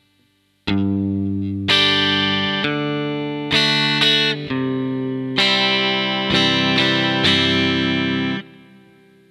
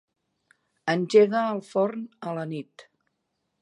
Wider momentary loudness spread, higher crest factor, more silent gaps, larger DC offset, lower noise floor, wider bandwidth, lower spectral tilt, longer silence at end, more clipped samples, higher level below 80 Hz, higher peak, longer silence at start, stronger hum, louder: second, 9 LU vs 16 LU; about the same, 18 dB vs 20 dB; neither; neither; second, -61 dBFS vs -78 dBFS; first, 13.5 kHz vs 10.5 kHz; second, -4.5 dB/octave vs -6 dB/octave; about the same, 0.75 s vs 0.8 s; neither; first, -52 dBFS vs -82 dBFS; first, 0 dBFS vs -6 dBFS; second, 0.65 s vs 0.85 s; neither; first, -17 LUFS vs -25 LUFS